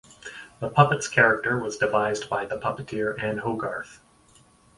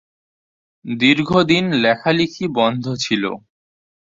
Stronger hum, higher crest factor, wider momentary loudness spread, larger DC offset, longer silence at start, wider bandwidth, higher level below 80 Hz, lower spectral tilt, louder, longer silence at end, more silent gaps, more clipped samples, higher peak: neither; first, 24 dB vs 18 dB; first, 17 LU vs 12 LU; neither; second, 0.25 s vs 0.85 s; first, 11.5 kHz vs 7.8 kHz; about the same, -58 dBFS vs -54 dBFS; about the same, -5 dB/octave vs -5 dB/octave; second, -24 LUFS vs -17 LUFS; about the same, 0.8 s vs 0.75 s; neither; neither; about the same, -2 dBFS vs -2 dBFS